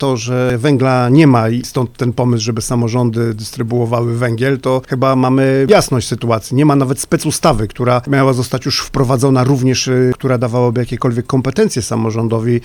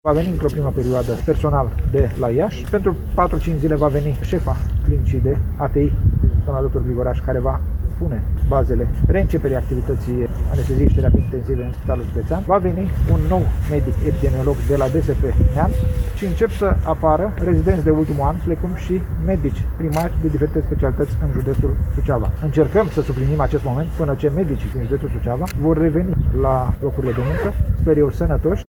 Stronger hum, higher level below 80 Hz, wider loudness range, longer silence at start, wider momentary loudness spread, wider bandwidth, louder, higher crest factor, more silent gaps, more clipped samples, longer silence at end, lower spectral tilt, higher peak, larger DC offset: neither; second, -38 dBFS vs -22 dBFS; about the same, 2 LU vs 2 LU; about the same, 0 s vs 0.05 s; about the same, 6 LU vs 6 LU; about the same, 18.5 kHz vs 19 kHz; first, -14 LUFS vs -19 LUFS; about the same, 14 dB vs 16 dB; neither; neither; about the same, 0 s vs 0.05 s; second, -6 dB/octave vs -9 dB/octave; about the same, 0 dBFS vs -2 dBFS; neither